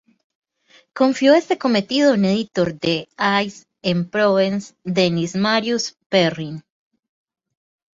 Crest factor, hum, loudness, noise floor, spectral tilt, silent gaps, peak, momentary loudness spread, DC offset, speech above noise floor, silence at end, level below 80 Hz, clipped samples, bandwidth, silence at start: 18 dB; none; -19 LUFS; -55 dBFS; -5 dB/octave; 6.06-6.10 s; -2 dBFS; 11 LU; under 0.1%; 37 dB; 1.35 s; -60 dBFS; under 0.1%; 7.8 kHz; 0.95 s